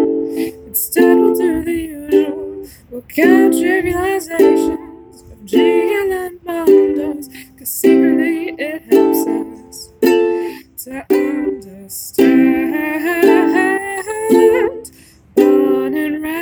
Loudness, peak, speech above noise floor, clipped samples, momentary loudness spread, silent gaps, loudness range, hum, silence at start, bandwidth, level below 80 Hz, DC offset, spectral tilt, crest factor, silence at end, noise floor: -14 LUFS; 0 dBFS; 29 dB; under 0.1%; 16 LU; none; 3 LU; none; 0 s; over 20 kHz; -46 dBFS; under 0.1%; -4.5 dB/octave; 14 dB; 0 s; -43 dBFS